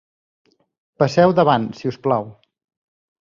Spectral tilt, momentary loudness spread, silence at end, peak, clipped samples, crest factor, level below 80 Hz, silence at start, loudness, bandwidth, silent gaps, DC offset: -7 dB/octave; 11 LU; 0.9 s; -2 dBFS; under 0.1%; 18 dB; -58 dBFS; 1 s; -18 LUFS; 7.4 kHz; none; under 0.1%